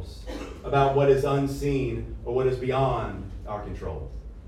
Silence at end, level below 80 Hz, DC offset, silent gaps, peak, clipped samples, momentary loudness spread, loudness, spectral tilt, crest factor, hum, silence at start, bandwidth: 0 s; -40 dBFS; under 0.1%; none; -10 dBFS; under 0.1%; 16 LU; -26 LUFS; -7.5 dB/octave; 18 dB; none; 0 s; 14 kHz